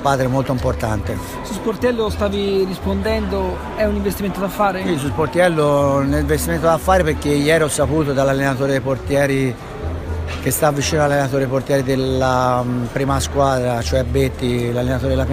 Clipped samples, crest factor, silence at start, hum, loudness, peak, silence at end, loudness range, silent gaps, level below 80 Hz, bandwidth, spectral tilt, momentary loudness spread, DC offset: under 0.1%; 16 dB; 0 s; none; -18 LUFS; -2 dBFS; 0 s; 4 LU; none; -32 dBFS; 15.5 kHz; -5.5 dB/octave; 7 LU; under 0.1%